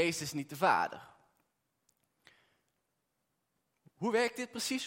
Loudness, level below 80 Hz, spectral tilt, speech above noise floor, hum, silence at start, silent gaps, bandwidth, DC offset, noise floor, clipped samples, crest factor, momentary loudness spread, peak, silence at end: -33 LUFS; -80 dBFS; -3.5 dB/octave; 49 dB; none; 0 s; none; 16.5 kHz; under 0.1%; -83 dBFS; under 0.1%; 22 dB; 10 LU; -14 dBFS; 0 s